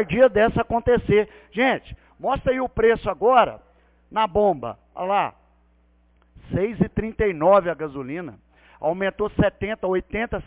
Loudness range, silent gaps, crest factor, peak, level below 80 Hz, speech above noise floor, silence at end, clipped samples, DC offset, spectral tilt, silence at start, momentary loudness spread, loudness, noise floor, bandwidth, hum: 4 LU; none; 16 dB; -6 dBFS; -42 dBFS; 38 dB; 0.05 s; under 0.1%; under 0.1%; -10 dB/octave; 0 s; 12 LU; -22 LUFS; -59 dBFS; 4 kHz; none